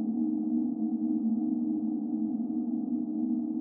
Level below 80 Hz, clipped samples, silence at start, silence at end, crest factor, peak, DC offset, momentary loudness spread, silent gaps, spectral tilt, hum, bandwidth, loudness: -78 dBFS; under 0.1%; 0 s; 0 s; 10 dB; -20 dBFS; under 0.1%; 2 LU; none; -14.5 dB/octave; none; 1.3 kHz; -31 LUFS